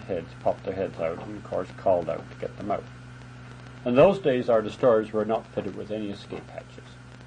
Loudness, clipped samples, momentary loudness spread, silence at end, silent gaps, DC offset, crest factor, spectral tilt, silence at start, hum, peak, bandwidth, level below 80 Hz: -26 LUFS; under 0.1%; 23 LU; 0 s; none; under 0.1%; 20 dB; -7.5 dB/octave; 0 s; none; -6 dBFS; 9.8 kHz; -56 dBFS